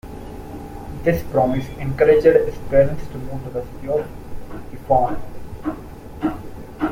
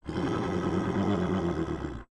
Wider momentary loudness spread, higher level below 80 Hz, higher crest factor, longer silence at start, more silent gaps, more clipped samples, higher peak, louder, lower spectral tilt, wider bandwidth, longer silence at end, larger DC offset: first, 20 LU vs 5 LU; first, -36 dBFS vs -48 dBFS; about the same, 18 dB vs 14 dB; about the same, 0.05 s vs 0.05 s; neither; neither; first, -2 dBFS vs -16 dBFS; first, -20 LUFS vs -30 LUFS; about the same, -8 dB/octave vs -7.5 dB/octave; first, 16.5 kHz vs 10.5 kHz; about the same, 0 s vs 0.05 s; neither